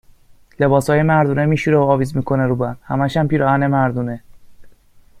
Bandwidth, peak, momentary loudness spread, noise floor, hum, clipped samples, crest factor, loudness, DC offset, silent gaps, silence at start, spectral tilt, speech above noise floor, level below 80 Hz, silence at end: 14 kHz; -2 dBFS; 7 LU; -47 dBFS; none; under 0.1%; 16 dB; -17 LUFS; under 0.1%; none; 0.6 s; -8 dB/octave; 31 dB; -46 dBFS; 0.5 s